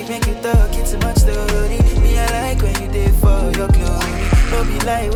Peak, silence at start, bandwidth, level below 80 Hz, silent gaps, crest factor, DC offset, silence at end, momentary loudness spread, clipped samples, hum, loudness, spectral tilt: -4 dBFS; 0 s; 16.5 kHz; -16 dBFS; none; 10 dB; under 0.1%; 0 s; 4 LU; under 0.1%; none; -17 LUFS; -5.5 dB/octave